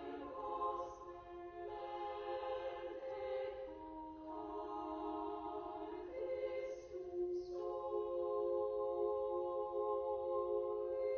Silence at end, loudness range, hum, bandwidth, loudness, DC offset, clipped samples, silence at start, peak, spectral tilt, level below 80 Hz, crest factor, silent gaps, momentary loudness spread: 0 s; 6 LU; none; 6.6 kHz; -43 LUFS; under 0.1%; under 0.1%; 0 s; -28 dBFS; -4.5 dB/octave; -68 dBFS; 14 dB; none; 10 LU